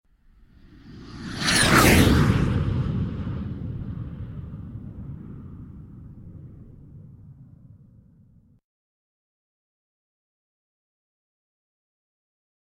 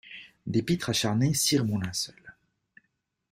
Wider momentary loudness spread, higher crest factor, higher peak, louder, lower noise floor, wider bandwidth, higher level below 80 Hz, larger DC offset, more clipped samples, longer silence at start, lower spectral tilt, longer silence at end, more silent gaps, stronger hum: first, 28 LU vs 12 LU; first, 24 dB vs 18 dB; first, -4 dBFS vs -12 dBFS; first, -21 LUFS vs -27 LUFS; second, -56 dBFS vs -78 dBFS; about the same, 16.5 kHz vs 16 kHz; first, -38 dBFS vs -58 dBFS; neither; neither; first, 0.85 s vs 0.05 s; about the same, -4.5 dB/octave vs -4 dB/octave; first, 5.2 s vs 1 s; neither; neither